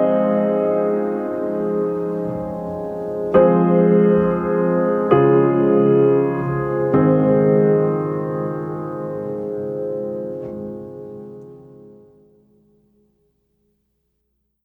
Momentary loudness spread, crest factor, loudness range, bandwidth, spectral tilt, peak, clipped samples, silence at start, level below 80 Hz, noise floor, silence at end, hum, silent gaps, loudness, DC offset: 14 LU; 18 dB; 14 LU; 3.4 kHz; -11 dB/octave; -2 dBFS; under 0.1%; 0 s; -52 dBFS; -71 dBFS; 2.75 s; none; none; -18 LUFS; under 0.1%